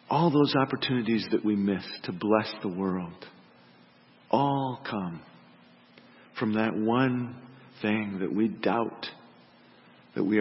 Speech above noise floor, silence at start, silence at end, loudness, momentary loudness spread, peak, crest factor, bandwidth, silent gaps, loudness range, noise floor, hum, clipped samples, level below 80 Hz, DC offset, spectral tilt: 30 dB; 0.1 s; 0 s; -28 LUFS; 15 LU; -8 dBFS; 22 dB; 5.8 kHz; none; 5 LU; -58 dBFS; none; under 0.1%; -72 dBFS; under 0.1%; -10.5 dB/octave